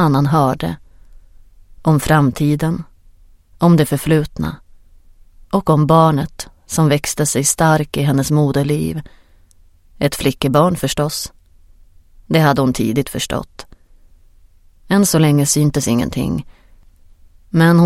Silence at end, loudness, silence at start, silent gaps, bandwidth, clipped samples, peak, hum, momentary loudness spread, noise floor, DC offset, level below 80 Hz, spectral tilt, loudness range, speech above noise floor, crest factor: 0 s; -16 LUFS; 0 s; none; 16.5 kHz; under 0.1%; 0 dBFS; none; 12 LU; -48 dBFS; under 0.1%; -40 dBFS; -5.5 dB/octave; 4 LU; 33 dB; 16 dB